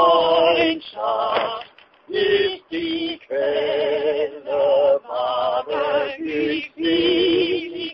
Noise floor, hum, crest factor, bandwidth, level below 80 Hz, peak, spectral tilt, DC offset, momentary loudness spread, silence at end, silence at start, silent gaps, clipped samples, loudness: -42 dBFS; none; 16 dB; 5.8 kHz; -58 dBFS; -4 dBFS; -6.5 dB/octave; under 0.1%; 9 LU; 0 s; 0 s; none; under 0.1%; -20 LUFS